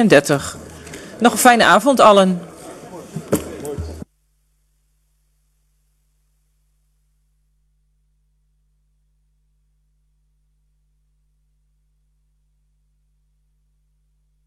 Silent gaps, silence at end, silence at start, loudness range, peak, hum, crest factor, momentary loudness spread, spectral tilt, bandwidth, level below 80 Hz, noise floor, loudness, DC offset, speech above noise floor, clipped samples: none; 10.45 s; 0 s; 21 LU; 0 dBFS; 50 Hz at -55 dBFS; 22 dB; 26 LU; -4 dB/octave; 14 kHz; -48 dBFS; -63 dBFS; -14 LUFS; under 0.1%; 50 dB; under 0.1%